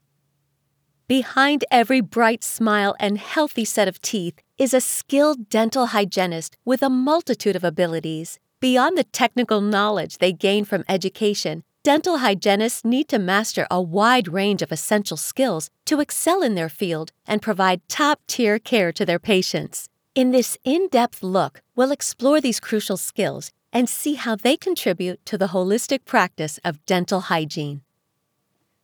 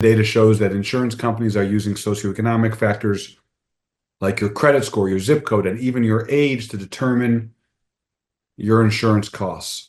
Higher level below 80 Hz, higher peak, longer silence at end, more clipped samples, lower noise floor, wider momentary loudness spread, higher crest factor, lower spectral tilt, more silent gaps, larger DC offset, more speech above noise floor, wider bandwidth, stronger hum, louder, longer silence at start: second, -72 dBFS vs -56 dBFS; second, -4 dBFS vs 0 dBFS; first, 1.05 s vs 0.05 s; neither; second, -73 dBFS vs -84 dBFS; about the same, 8 LU vs 10 LU; about the same, 18 dB vs 18 dB; second, -4 dB/octave vs -6.5 dB/octave; neither; neither; second, 53 dB vs 66 dB; first, over 20 kHz vs 12.5 kHz; neither; about the same, -21 LUFS vs -19 LUFS; first, 1.1 s vs 0 s